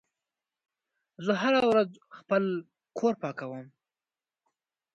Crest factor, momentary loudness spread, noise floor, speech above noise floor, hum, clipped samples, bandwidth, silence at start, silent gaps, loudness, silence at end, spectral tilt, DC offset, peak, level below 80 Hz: 20 dB; 16 LU; under -90 dBFS; over 62 dB; none; under 0.1%; 9.2 kHz; 1.2 s; none; -28 LUFS; 1.3 s; -6 dB/octave; under 0.1%; -12 dBFS; -74 dBFS